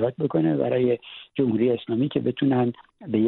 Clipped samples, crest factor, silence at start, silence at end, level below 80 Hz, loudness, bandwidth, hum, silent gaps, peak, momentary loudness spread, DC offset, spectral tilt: under 0.1%; 14 dB; 0 s; 0 s; -64 dBFS; -24 LUFS; 4.2 kHz; none; none; -8 dBFS; 6 LU; under 0.1%; -11.5 dB/octave